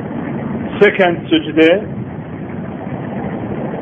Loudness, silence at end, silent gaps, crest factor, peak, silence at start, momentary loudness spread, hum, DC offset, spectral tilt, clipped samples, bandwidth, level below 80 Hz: -16 LUFS; 0 s; none; 16 dB; 0 dBFS; 0 s; 14 LU; none; under 0.1%; -8 dB/octave; under 0.1%; 6.4 kHz; -46 dBFS